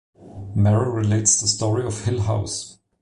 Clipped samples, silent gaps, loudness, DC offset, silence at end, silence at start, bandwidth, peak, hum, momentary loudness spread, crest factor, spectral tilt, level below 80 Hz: under 0.1%; none; -21 LUFS; under 0.1%; 0.3 s; 0.2 s; 11 kHz; -4 dBFS; none; 13 LU; 18 dB; -4.5 dB/octave; -42 dBFS